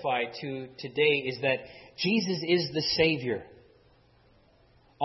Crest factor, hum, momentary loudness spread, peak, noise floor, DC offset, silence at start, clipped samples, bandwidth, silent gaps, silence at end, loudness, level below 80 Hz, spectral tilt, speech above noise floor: 20 dB; none; 12 LU; -10 dBFS; -62 dBFS; under 0.1%; 0 s; under 0.1%; 6 kHz; none; 0 s; -28 LUFS; -64 dBFS; -5.5 dB/octave; 33 dB